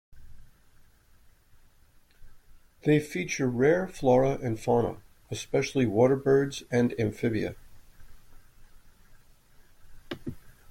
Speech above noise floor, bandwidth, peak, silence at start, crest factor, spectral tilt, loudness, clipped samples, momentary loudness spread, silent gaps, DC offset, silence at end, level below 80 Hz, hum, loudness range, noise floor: 33 dB; 16.5 kHz; -10 dBFS; 0.15 s; 20 dB; -6.5 dB/octave; -27 LUFS; under 0.1%; 17 LU; none; under 0.1%; 0.2 s; -54 dBFS; none; 9 LU; -59 dBFS